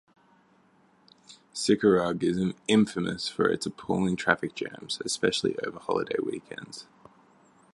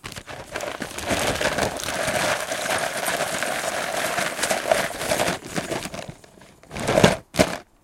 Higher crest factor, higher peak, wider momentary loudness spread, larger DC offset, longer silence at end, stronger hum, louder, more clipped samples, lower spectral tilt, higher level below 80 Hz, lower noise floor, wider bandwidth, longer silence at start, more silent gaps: about the same, 24 dB vs 24 dB; second, -4 dBFS vs 0 dBFS; first, 14 LU vs 11 LU; neither; first, 0.9 s vs 0.2 s; neither; second, -27 LUFS vs -24 LUFS; neither; first, -4.5 dB/octave vs -3 dB/octave; second, -62 dBFS vs -46 dBFS; first, -63 dBFS vs -49 dBFS; second, 11.5 kHz vs 17 kHz; first, 1.3 s vs 0.05 s; neither